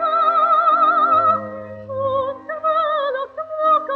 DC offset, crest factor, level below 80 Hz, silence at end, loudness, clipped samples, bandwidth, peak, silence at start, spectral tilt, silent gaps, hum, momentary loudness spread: under 0.1%; 12 dB; -64 dBFS; 0 s; -17 LUFS; under 0.1%; 4.7 kHz; -6 dBFS; 0 s; -6.5 dB/octave; none; none; 13 LU